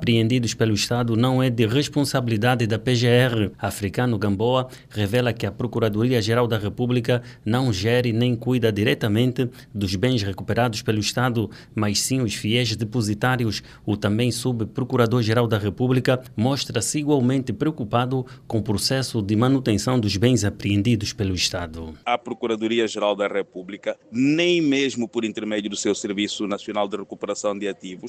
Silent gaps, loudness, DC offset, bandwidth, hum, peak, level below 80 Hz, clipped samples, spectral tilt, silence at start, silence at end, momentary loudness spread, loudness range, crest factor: none; -22 LUFS; under 0.1%; 15.5 kHz; none; -4 dBFS; -52 dBFS; under 0.1%; -5.5 dB/octave; 0 s; 0 s; 7 LU; 2 LU; 18 dB